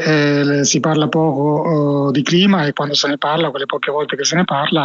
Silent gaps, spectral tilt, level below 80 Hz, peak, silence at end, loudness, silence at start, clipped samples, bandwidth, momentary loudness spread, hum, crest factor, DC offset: none; -4.5 dB/octave; -60 dBFS; -2 dBFS; 0 s; -15 LUFS; 0 s; under 0.1%; 7.8 kHz; 5 LU; none; 14 dB; under 0.1%